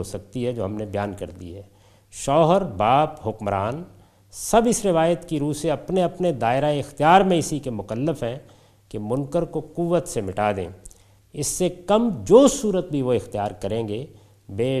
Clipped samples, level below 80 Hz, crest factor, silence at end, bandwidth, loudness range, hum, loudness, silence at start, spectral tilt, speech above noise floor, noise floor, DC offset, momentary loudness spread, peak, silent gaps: under 0.1%; -48 dBFS; 22 dB; 0 s; 15 kHz; 5 LU; none; -22 LUFS; 0 s; -5.5 dB/octave; 26 dB; -48 dBFS; under 0.1%; 18 LU; -2 dBFS; none